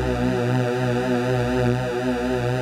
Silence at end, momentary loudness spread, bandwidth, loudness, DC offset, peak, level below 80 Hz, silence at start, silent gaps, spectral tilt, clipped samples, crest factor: 0 s; 2 LU; 14.5 kHz; -22 LUFS; under 0.1%; -8 dBFS; -38 dBFS; 0 s; none; -7 dB/octave; under 0.1%; 14 dB